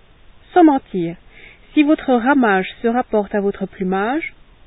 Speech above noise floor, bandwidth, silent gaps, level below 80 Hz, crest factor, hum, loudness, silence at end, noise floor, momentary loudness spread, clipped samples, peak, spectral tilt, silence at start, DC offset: 29 dB; 4 kHz; none; -50 dBFS; 18 dB; none; -17 LUFS; 0.4 s; -46 dBFS; 11 LU; under 0.1%; 0 dBFS; -11.5 dB/octave; 0.55 s; under 0.1%